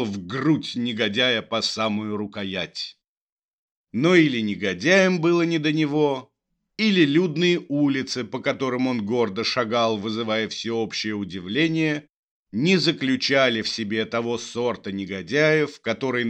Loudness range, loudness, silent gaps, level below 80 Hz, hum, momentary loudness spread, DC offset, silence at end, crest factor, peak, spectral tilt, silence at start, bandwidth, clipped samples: 4 LU; -22 LUFS; 3.08-3.37 s, 3.43-3.84 s, 12.09-12.46 s; -68 dBFS; none; 10 LU; under 0.1%; 0 s; 20 dB; -2 dBFS; -5 dB/octave; 0 s; 9.2 kHz; under 0.1%